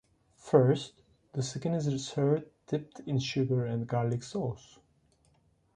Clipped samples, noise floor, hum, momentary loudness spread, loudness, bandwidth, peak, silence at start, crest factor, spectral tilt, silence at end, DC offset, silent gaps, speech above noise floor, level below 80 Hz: under 0.1%; -68 dBFS; none; 11 LU; -31 LUFS; 10 kHz; -10 dBFS; 0.45 s; 22 dB; -6.5 dB/octave; 1.2 s; under 0.1%; none; 38 dB; -66 dBFS